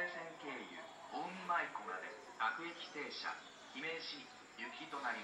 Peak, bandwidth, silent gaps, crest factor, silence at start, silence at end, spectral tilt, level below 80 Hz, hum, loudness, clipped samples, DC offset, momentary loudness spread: -26 dBFS; 15.5 kHz; none; 20 dB; 0 s; 0 s; -3 dB/octave; -88 dBFS; none; -44 LUFS; under 0.1%; under 0.1%; 12 LU